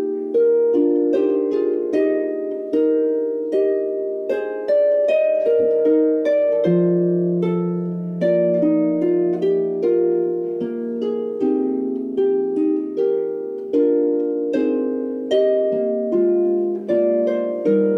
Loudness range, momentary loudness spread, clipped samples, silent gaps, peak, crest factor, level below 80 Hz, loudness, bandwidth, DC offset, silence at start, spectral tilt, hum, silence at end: 3 LU; 7 LU; under 0.1%; none; -8 dBFS; 12 dB; -70 dBFS; -19 LUFS; 6.2 kHz; under 0.1%; 0 s; -9.5 dB/octave; none; 0 s